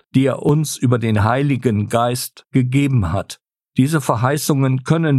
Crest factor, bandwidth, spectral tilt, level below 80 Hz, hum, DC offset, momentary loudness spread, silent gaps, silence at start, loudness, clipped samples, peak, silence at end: 16 dB; 14 kHz; -6.5 dB/octave; -44 dBFS; none; under 0.1%; 7 LU; none; 0.15 s; -18 LUFS; under 0.1%; -2 dBFS; 0 s